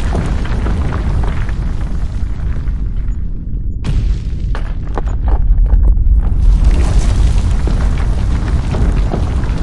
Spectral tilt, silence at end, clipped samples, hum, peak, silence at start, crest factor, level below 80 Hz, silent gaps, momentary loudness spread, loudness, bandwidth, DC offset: -7 dB/octave; 0 s; under 0.1%; none; 0 dBFS; 0 s; 12 dB; -14 dBFS; none; 8 LU; -17 LUFS; 10.5 kHz; 5%